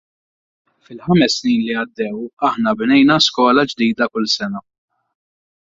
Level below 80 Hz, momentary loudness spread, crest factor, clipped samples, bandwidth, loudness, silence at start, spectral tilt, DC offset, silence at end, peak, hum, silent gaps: -56 dBFS; 12 LU; 16 dB; under 0.1%; 7.8 kHz; -16 LUFS; 0.9 s; -4.5 dB/octave; under 0.1%; 1.15 s; -2 dBFS; none; 2.33-2.37 s